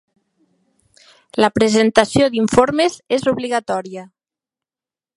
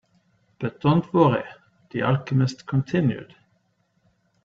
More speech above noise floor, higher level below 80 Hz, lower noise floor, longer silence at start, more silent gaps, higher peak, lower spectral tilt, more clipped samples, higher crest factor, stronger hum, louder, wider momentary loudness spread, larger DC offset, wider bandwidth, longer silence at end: first, over 74 dB vs 46 dB; first, -50 dBFS vs -60 dBFS; first, under -90 dBFS vs -68 dBFS; first, 1.35 s vs 0.6 s; neither; first, 0 dBFS vs -4 dBFS; second, -4.5 dB/octave vs -8 dB/octave; neither; about the same, 18 dB vs 20 dB; neither; first, -16 LUFS vs -23 LUFS; about the same, 11 LU vs 13 LU; neither; first, 11.5 kHz vs 7.6 kHz; about the same, 1.1 s vs 1.2 s